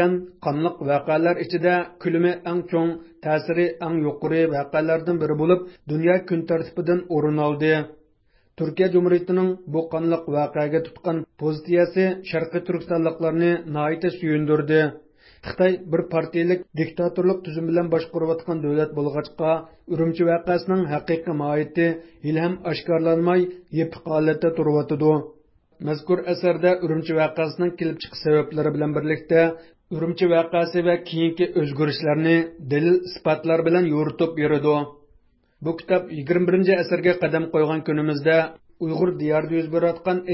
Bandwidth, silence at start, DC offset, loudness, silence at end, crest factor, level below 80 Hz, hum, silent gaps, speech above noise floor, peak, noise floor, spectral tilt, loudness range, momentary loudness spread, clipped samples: 5.8 kHz; 0 s; under 0.1%; -22 LUFS; 0 s; 16 dB; -60 dBFS; none; none; 40 dB; -4 dBFS; -61 dBFS; -11.5 dB/octave; 2 LU; 7 LU; under 0.1%